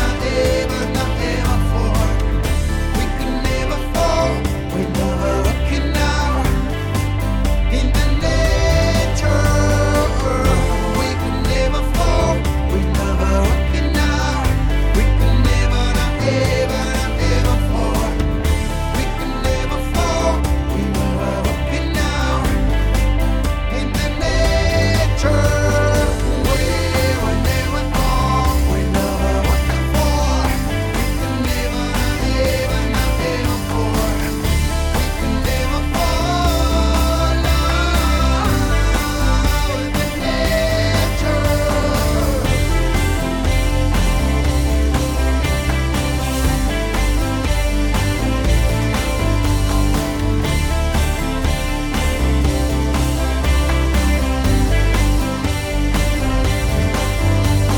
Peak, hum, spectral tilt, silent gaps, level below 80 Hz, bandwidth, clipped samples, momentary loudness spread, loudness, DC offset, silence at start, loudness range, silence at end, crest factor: -4 dBFS; none; -5.5 dB/octave; none; -18 dBFS; 19.5 kHz; under 0.1%; 4 LU; -18 LUFS; under 0.1%; 0 s; 2 LU; 0 s; 12 dB